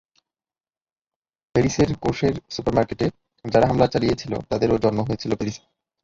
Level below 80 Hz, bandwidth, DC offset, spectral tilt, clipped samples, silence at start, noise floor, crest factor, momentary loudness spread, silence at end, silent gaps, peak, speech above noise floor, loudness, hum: -44 dBFS; 7.8 kHz; under 0.1%; -6.5 dB/octave; under 0.1%; 1.55 s; under -90 dBFS; 20 dB; 8 LU; 0.45 s; none; -2 dBFS; over 69 dB; -22 LUFS; none